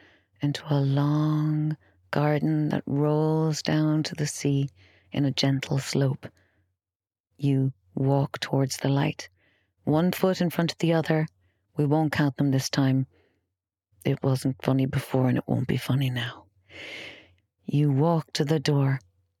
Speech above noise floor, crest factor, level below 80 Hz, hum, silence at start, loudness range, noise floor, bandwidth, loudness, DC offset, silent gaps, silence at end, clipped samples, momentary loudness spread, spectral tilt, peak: over 65 dB; 20 dB; -62 dBFS; none; 0.4 s; 3 LU; under -90 dBFS; 15 kHz; -26 LUFS; under 0.1%; 6.95-7.00 s, 7.20-7.24 s; 0.4 s; under 0.1%; 11 LU; -6.5 dB/octave; -6 dBFS